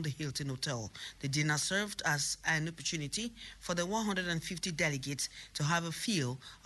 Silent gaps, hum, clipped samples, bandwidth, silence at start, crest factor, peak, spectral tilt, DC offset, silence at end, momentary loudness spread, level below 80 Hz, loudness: none; none; under 0.1%; 12 kHz; 0 s; 16 dB; -18 dBFS; -3.5 dB/octave; under 0.1%; 0.1 s; 6 LU; -62 dBFS; -35 LUFS